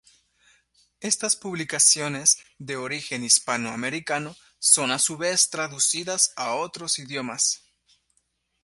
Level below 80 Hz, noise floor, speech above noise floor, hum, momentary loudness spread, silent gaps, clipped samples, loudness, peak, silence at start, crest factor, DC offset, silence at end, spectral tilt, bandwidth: -70 dBFS; -72 dBFS; 47 dB; none; 12 LU; none; under 0.1%; -22 LUFS; -2 dBFS; 1 s; 24 dB; under 0.1%; 1.05 s; -1 dB/octave; 12 kHz